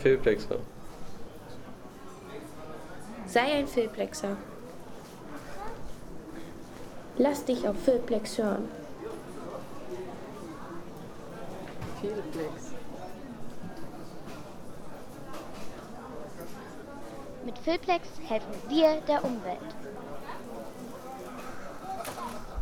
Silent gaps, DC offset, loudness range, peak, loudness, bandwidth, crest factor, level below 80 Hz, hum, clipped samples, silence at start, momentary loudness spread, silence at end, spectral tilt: none; under 0.1%; 13 LU; -10 dBFS; -34 LUFS; 19.5 kHz; 22 dB; -52 dBFS; none; under 0.1%; 0 s; 18 LU; 0 s; -5 dB/octave